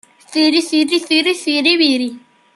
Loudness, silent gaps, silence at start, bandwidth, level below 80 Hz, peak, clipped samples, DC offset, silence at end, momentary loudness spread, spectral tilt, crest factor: -14 LUFS; none; 0.3 s; 12 kHz; -70 dBFS; 0 dBFS; under 0.1%; under 0.1%; 0.4 s; 8 LU; -1.5 dB/octave; 16 dB